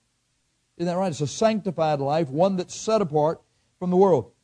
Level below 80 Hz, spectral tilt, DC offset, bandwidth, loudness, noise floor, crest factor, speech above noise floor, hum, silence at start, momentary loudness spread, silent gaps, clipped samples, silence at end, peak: -64 dBFS; -6 dB/octave; under 0.1%; 10 kHz; -23 LUFS; -71 dBFS; 16 dB; 48 dB; none; 0.8 s; 8 LU; none; under 0.1%; 0.15 s; -6 dBFS